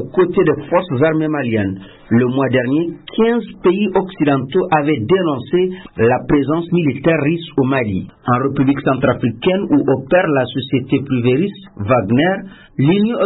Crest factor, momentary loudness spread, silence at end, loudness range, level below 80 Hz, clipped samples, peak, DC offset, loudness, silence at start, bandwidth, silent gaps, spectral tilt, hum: 14 dB; 5 LU; 0 s; 1 LU; -46 dBFS; under 0.1%; -2 dBFS; under 0.1%; -16 LUFS; 0 s; 4.1 kHz; none; -12.5 dB/octave; none